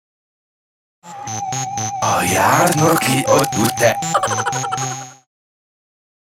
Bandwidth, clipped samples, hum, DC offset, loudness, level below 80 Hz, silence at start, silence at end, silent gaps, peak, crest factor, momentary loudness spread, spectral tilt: 17 kHz; under 0.1%; none; under 0.1%; -17 LUFS; -56 dBFS; 1.05 s; 1.15 s; none; -2 dBFS; 18 dB; 14 LU; -3.5 dB/octave